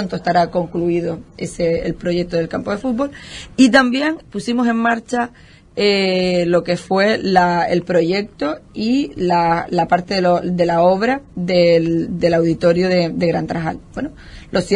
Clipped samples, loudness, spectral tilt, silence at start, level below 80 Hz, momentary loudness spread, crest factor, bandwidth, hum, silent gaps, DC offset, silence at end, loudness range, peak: under 0.1%; -17 LUFS; -6 dB/octave; 0 s; -44 dBFS; 10 LU; 16 dB; 11 kHz; none; none; under 0.1%; 0 s; 2 LU; 0 dBFS